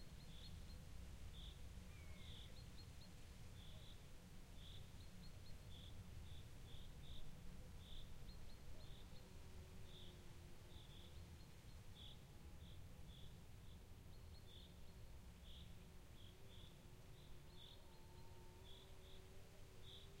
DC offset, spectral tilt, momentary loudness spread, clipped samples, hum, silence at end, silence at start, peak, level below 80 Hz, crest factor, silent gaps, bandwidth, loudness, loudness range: under 0.1%; -4.5 dB/octave; 4 LU; under 0.1%; none; 0 s; 0 s; -42 dBFS; -62 dBFS; 16 dB; none; 16 kHz; -61 LUFS; 3 LU